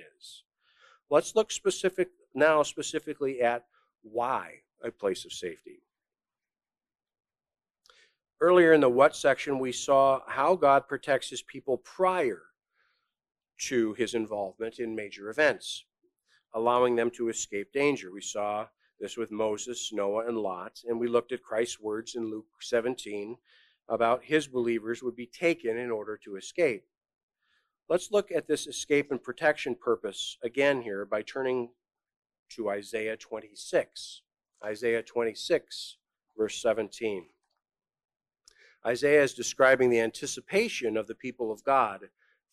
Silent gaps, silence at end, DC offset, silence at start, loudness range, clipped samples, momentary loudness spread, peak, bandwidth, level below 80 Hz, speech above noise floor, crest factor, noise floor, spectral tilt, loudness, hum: 0.45-0.49 s, 27.23-27.28 s, 32.16-32.22 s, 32.39-32.46 s, 38.05-38.09 s; 0.45 s; under 0.1%; 0 s; 8 LU; under 0.1%; 15 LU; -8 dBFS; 13.5 kHz; -70 dBFS; over 62 dB; 22 dB; under -90 dBFS; -3.5 dB/octave; -29 LUFS; none